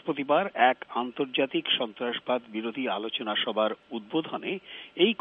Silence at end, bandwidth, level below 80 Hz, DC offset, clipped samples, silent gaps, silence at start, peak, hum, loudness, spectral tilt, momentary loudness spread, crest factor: 0.05 s; 4.3 kHz; -78 dBFS; under 0.1%; under 0.1%; none; 0.05 s; -8 dBFS; none; -28 LUFS; -7.5 dB/octave; 10 LU; 20 dB